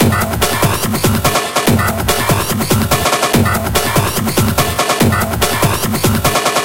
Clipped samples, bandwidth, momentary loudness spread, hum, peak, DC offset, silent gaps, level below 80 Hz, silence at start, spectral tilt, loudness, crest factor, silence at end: under 0.1%; 17.5 kHz; 2 LU; none; 0 dBFS; 2%; none; -30 dBFS; 0 s; -4 dB/octave; -13 LUFS; 14 dB; 0 s